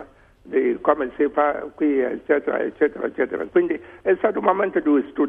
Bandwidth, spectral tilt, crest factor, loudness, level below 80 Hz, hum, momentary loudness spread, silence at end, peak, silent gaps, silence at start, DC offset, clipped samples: 3.7 kHz; -8.5 dB/octave; 18 dB; -22 LUFS; -58 dBFS; none; 5 LU; 0 s; -4 dBFS; none; 0 s; under 0.1%; under 0.1%